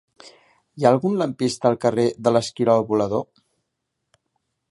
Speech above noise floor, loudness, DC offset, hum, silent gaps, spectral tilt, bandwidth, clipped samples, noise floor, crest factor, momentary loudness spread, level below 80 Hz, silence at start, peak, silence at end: 58 dB; -21 LUFS; under 0.1%; none; none; -6 dB/octave; 11.5 kHz; under 0.1%; -78 dBFS; 20 dB; 5 LU; -62 dBFS; 0.25 s; -2 dBFS; 1.5 s